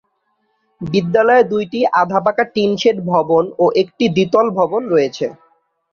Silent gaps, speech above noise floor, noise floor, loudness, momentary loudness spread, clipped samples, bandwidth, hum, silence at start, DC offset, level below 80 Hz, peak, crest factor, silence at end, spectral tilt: none; 51 dB; -66 dBFS; -15 LUFS; 7 LU; under 0.1%; 7 kHz; none; 0.8 s; under 0.1%; -56 dBFS; -2 dBFS; 14 dB; 0.6 s; -6 dB/octave